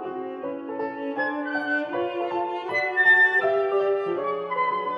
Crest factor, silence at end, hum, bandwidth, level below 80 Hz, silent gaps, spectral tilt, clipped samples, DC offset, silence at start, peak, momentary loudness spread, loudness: 16 dB; 0 s; none; 9.4 kHz; -82 dBFS; none; -5.5 dB/octave; under 0.1%; under 0.1%; 0 s; -8 dBFS; 15 LU; -23 LUFS